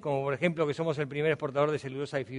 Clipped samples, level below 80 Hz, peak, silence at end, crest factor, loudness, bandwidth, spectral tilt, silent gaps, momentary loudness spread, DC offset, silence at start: under 0.1%; -68 dBFS; -12 dBFS; 0 s; 18 dB; -30 LUFS; 10.5 kHz; -7 dB/octave; none; 6 LU; under 0.1%; 0 s